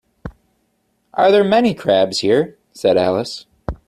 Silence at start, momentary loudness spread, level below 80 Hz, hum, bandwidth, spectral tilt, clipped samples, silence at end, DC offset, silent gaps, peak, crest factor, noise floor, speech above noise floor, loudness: 0.25 s; 19 LU; -42 dBFS; none; 13.5 kHz; -5.5 dB/octave; under 0.1%; 0.1 s; under 0.1%; none; -2 dBFS; 14 dB; -65 dBFS; 50 dB; -16 LUFS